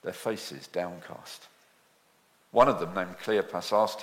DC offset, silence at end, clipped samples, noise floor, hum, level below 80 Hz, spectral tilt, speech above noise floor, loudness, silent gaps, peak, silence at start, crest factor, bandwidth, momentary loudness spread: under 0.1%; 0 s; under 0.1%; -65 dBFS; none; -66 dBFS; -4.5 dB/octave; 36 dB; -29 LUFS; none; -8 dBFS; 0.05 s; 22 dB; 16.5 kHz; 20 LU